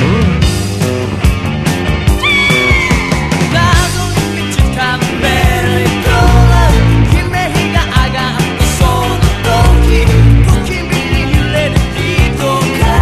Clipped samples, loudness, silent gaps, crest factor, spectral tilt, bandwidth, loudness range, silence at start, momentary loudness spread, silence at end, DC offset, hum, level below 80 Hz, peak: 0.4%; -11 LUFS; none; 10 dB; -5.5 dB/octave; 14.5 kHz; 1 LU; 0 s; 6 LU; 0 s; under 0.1%; none; -14 dBFS; 0 dBFS